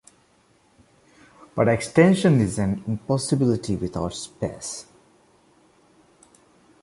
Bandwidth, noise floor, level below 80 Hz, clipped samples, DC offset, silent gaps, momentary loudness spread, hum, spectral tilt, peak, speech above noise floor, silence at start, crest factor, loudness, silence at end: 11.5 kHz; -60 dBFS; -50 dBFS; under 0.1%; under 0.1%; none; 15 LU; none; -6 dB/octave; -2 dBFS; 39 dB; 1.55 s; 22 dB; -22 LUFS; 2 s